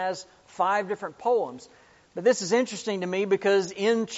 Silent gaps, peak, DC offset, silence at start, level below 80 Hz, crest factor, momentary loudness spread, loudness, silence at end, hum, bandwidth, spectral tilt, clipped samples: none; -10 dBFS; under 0.1%; 0 s; -72 dBFS; 16 dB; 14 LU; -26 LUFS; 0 s; none; 8 kHz; -3 dB/octave; under 0.1%